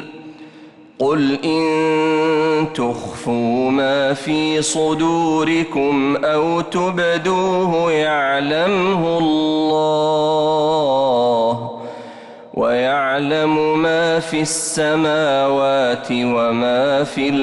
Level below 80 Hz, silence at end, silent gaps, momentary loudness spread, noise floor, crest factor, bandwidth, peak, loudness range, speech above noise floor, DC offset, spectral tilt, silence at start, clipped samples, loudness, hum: -54 dBFS; 0 s; none; 5 LU; -42 dBFS; 8 dB; 11.5 kHz; -8 dBFS; 2 LU; 25 dB; under 0.1%; -4.5 dB/octave; 0 s; under 0.1%; -17 LUFS; none